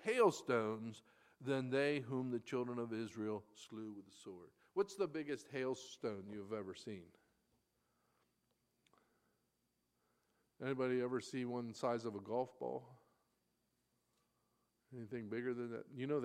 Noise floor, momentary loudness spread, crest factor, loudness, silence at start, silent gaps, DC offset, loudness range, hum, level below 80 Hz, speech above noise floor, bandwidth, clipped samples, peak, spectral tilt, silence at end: -85 dBFS; 15 LU; 24 dB; -42 LUFS; 0 s; none; under 0.1%; 9 LU; none; -88 dBFS; 43 dB; 14 kHz; under 0.1%; -20 dBFS; -6 dB/octave; 0 s